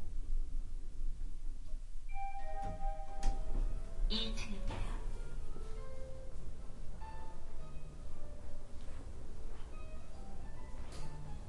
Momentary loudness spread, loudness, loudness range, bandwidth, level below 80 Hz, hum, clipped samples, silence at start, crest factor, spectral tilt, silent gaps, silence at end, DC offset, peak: 10 LU; -47 LUFS; 9 LU; 10.5 kHz; -40 dBFS; none; under 0.1%; 0 s; 16 dB; -5 dB/octave; none; 0 s; under 0.1%; -18 dBFS